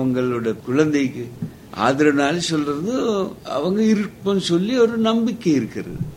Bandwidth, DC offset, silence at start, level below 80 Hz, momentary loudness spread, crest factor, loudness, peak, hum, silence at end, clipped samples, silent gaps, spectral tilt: 16 kHz; under 0.1%; 0 s; -52 dBFS; 9 LU; 16 dB; -20 LUFS; -2 dBFS; none; 0 s; under 0.1%; none; -5.5 dB/octave